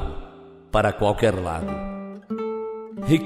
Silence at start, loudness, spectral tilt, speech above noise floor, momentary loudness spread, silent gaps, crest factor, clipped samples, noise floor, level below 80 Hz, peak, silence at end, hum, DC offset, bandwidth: 0 s; -25 LUFS; -6.5 dB/octave; 22 dB; 15 LU; none; 20 dB; under 0.1%; -44 dBFS; -38 dBFS; -6 dBFS; 0 s; none; under 0.1%; 14.5 kHz